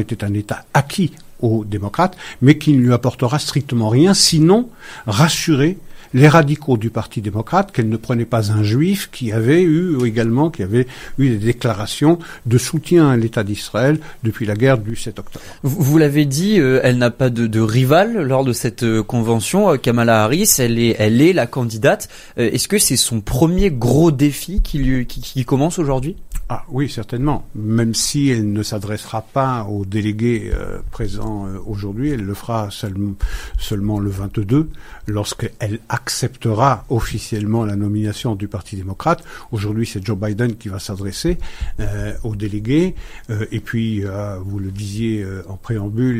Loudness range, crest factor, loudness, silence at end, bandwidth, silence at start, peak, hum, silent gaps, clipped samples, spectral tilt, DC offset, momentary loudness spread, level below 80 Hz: 8 LU; 16 dB; -17 LUFS; 0 s; 16 kHz; 0 s; 0 dBFS; none; none; under 0.1%; -5.5 dB/octave; under 0.1%; 13 LU; -32 dBFS